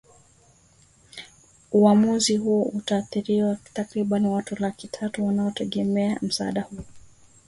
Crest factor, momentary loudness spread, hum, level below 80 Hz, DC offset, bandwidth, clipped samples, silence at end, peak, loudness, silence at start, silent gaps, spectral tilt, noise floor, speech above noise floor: 18 dB; 15 LU; none; -58 dBFS; under 0.1%; 11.5 kHz; under 0.1%; 0.5 s; -6 dBFS; -24 LUFS; 1.15 s; none; -5.5 dB/octave; -57 dBFS; 34 dB